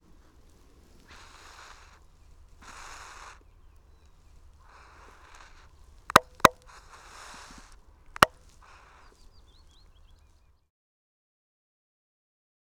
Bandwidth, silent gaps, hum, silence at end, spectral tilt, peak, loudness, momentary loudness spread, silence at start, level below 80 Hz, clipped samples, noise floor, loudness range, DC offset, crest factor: 19.5 kHz; none; none; 4.45 s; -2.5 dB/octave; 0 dBFS; -23 LUFS; 29 LU; 6.15 s; -54 dBFS; under 0.1%; -61 dBFS; 23 LU; under 0.1%; 34 dB